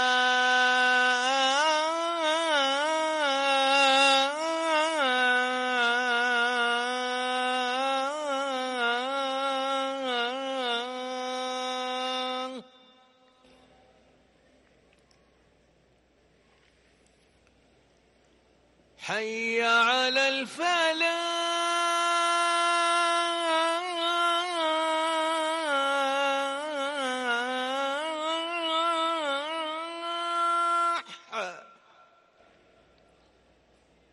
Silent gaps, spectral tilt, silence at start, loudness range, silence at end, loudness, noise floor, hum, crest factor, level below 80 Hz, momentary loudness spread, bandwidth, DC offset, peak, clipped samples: none; -0.5 dB/octave; 0 s; 10 LU; 2.45 s; -26 LUFS; -64 dBFS; none; 16 dB; -76 dBFS; 9 LU; 11.5 kHz; under 0.1%; -14 dBFS; under 0.1%